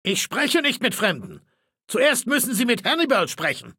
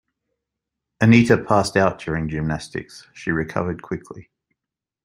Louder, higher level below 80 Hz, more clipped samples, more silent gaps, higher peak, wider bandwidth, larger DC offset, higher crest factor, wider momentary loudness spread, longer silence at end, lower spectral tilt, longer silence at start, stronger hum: about the same, -21 LUFS vs -20 LUFS; second, -68 dBFS vs -48 dBFS; neither; neither; about the same, -4 dBFS vs -2 dBFS; first, 17 kHz vs 12 kHz; neither; about the same, 18 dB vs 20 dB; second, 5 LU vs 17 LU; second, 0.05 s vs 0.85 s; second, -2.5 dB/octave vs -6.5 dB/octave; second, 0.05 s vs 1 s; neither